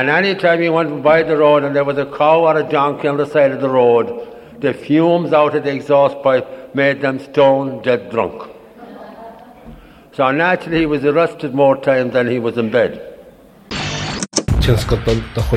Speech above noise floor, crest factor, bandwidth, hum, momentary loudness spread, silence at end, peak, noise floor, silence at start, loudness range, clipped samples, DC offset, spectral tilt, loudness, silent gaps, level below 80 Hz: 28 dB; 16 dB; 14.5 kHz; none; 11 LU; 0 s; 0 dBFS; -42 dBFS; 0 s; 5 LU; under 0.1%; under 0.1%; -5.5 dB/octave; -15 LUFS; none; -32 dBFS